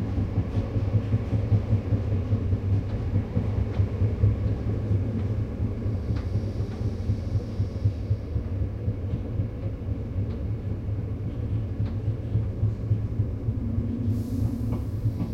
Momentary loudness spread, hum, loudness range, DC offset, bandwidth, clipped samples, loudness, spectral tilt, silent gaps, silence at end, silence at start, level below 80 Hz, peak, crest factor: 5 LU; none; 4 LU; under 0.1%; 6 kHz; under 0.1%; -28 LUFS; -10 dB/octave; none; 0 s; 0 s; -36 dBFS; -8 dBFS; 18 dB